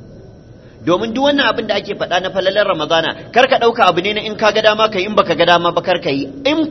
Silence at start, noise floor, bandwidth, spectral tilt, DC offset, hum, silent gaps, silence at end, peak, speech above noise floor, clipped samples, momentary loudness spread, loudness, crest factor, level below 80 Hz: 0 s; -39 dBFS; 7.2 kHz; -4.5 dB/octave; under 0.1%; none; none; 0 s; 0 dBFS; 25 dB; under 0.1%; 7 LU; -14 LUFS; 16 dB; -48 dBFS